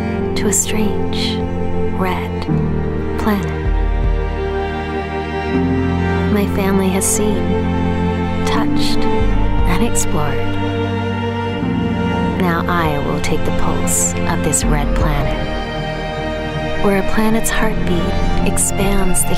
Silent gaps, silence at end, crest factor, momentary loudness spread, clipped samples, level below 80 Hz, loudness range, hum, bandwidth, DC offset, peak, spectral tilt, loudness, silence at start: none; 0 s; 12 dB; 6 LU; under 0.1%; -22 dBFS; 3 LU; none; 16 kHz; under 0.1%; -4 dBFS; -5 dB/octave; -18 LUFS; 0 s